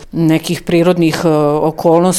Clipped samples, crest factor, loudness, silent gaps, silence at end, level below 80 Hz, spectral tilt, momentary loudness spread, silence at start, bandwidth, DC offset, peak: under 0.1%; 12 dB; -13 LUFS; none; 0 s; -42 dBFS; -6 dB/octave; 3 LU; 0 s; 16 kHz; under 0.1%; 0 dBFS